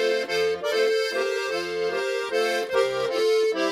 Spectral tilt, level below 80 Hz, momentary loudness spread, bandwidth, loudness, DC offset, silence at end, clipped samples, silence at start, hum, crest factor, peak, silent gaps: -2.5 dB/octave; -66 dBFS; 4 LU; 16 kHz; -24 LUFS; under 0.1%; 0 s; under 0.1%; 0 s; none; 16 dB; -8 dBFS; none